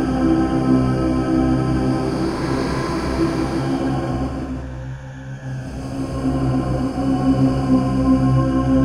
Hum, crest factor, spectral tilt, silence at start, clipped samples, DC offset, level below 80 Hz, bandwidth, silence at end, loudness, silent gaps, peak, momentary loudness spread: none; 14 dB; -8 dB/octave; 0 s; under 0.1%; under 0.1%; -30 dBFS; 11 kHz; 0 s; -20 LUFS; none; -4 dBFS; 12 LU